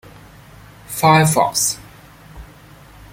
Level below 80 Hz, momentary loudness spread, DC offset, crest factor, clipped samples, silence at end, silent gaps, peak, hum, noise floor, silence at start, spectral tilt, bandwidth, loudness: -46 dBFS; 16 LU; under 0.1%; 18 dB; under 0.1%; 0.7 s; none; -2 dBFS; none; -43 dBFS; 0.9 s; -4 dB/octave; 16.5 kHz; -15 LUFS